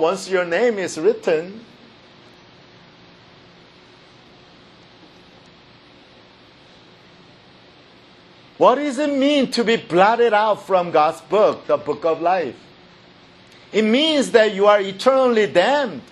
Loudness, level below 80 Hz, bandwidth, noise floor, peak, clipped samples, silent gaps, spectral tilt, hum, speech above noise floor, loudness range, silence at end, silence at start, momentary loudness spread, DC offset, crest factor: -18 LUFS; -66 dBFS; 12 kHz; -48 dBFS; 0 dBFS; under 0.1%; none; -4.5 dB/octave; none; 31 dB; 8 LU; 0.1 s; 0 s; 7 LU; under 0.1%; 20 dB